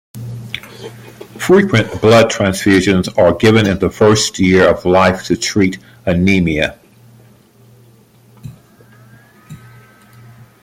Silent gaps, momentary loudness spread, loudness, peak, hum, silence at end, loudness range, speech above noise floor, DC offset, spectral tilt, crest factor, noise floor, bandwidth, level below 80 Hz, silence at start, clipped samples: none; 17 LU; -12 LUFS; 0 dBFS; none; 1.05 s; 8 LU; 34 dB; under 0.1%; -5 dB/octave; 14 dB; -46 dBFS; 16 kHz; -44 dBFS; 0.15 s; under 0.1%